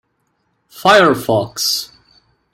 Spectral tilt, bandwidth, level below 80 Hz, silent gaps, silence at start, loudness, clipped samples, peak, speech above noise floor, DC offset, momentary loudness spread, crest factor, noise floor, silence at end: -3.5 dB/octave; 16.5 kHz; -54 dBFS; none; 0.75 s; -14 LUFS; under 0.1%; 0 dBFS; 52 dB; under 0.1%; 10 LU; 16 dB; -66 dBFS; 0.7 s